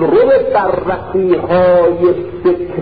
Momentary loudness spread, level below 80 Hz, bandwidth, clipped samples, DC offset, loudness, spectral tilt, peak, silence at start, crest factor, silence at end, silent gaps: 6 LU; -40 dBFS; 4.9 kHz; under 0.1%; under 0.1%; -12 LUFS; -12 dB/octave; -2 dBFS; 0 s; 10 dB; 0 s; none